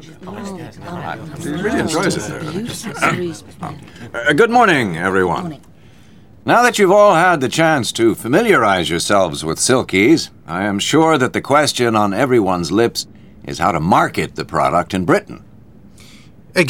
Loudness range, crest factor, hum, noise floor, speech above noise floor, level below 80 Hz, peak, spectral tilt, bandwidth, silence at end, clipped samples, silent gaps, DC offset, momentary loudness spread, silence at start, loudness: 7 LU; 16 dB; none; -44 dBFS; 29 dB; -48 dBFS; 0 dBFS; -4.5 dB/octave; 18 kHz; 0 s; under 0.1%; none; 0.5%; 18 LU; 0 s; -15 LUFS